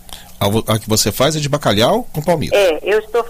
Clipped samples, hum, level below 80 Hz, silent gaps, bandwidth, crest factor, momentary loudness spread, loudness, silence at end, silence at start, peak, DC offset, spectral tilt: under 0.1%; none; -36 dBFS; none; 16 kHz; 14 dB; 5 LU; -15 LUFS; 0 s; 0.1 s; -2 dBFS; under 0.1%; -4 dB/octave